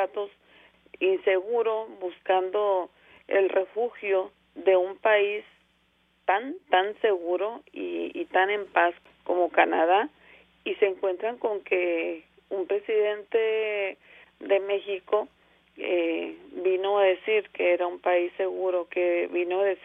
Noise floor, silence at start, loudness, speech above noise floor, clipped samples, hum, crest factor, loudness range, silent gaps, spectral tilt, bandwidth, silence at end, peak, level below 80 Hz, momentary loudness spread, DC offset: -67 dBFS; 0 s; -26 LUFS; 41 dB; under 0.1%; none; 20 dB; 3 LU; none; -6 dB/octave; 3.8 kHz; 0.1 s; -6 dBFS; -74 dBFS; 11 LU; under 0.1%